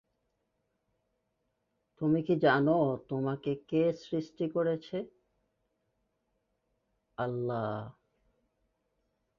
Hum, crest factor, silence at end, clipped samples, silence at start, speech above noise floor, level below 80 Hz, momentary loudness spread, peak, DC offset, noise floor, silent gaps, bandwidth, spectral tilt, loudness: none; 20 dB; 1.5 s; under 0.1%; 2 s; 50 dB; -70 dBFS; 14 LU; -14 dBFS; under 0.1%; -80 dBFS; none; 7 kHz; -8.5 dB/octave; -32 LUFS